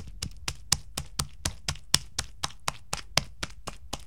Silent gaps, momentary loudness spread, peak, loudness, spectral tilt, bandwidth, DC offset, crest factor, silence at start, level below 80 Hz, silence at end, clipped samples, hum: none; 12 LU; 0 dBFS; -31 LUFS; -1.5 dB/octave; 17 kHz; 0.7%; 34 dB; 0 s; -46 dBFS; 0 s; under 0.1%; none